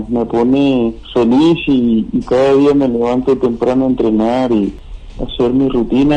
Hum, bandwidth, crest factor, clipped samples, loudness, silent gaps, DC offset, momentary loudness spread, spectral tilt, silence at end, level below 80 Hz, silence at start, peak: none; 9 kHz; 10 dB; under 0.1%; -13 LUFS; none; under 0.1%; 6 LU; -7.5 dB/octave; 0 s; -34 dBFS; 0 s; -2 dBFS